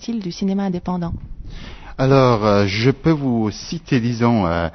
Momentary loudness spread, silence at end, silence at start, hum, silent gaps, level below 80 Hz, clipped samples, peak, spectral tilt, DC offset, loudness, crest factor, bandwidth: 20 LU; 0.05 s; 0 s; none; none; -38 dBFS; under 0.1%; -2 dBFS; -7 dB/octave; under 0.1%; -18 LUFS; 16 dB; 6.4 kHz